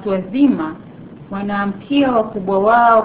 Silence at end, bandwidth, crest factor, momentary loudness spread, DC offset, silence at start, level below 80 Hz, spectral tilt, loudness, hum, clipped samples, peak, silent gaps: 0 s; 4 kHz; 16 dB; 14 LU; 0.2%; 0 s; -50 dBFS; -10.5 dB/octave; -16 LUFS; none; under 0.1%; 0 dBFS; none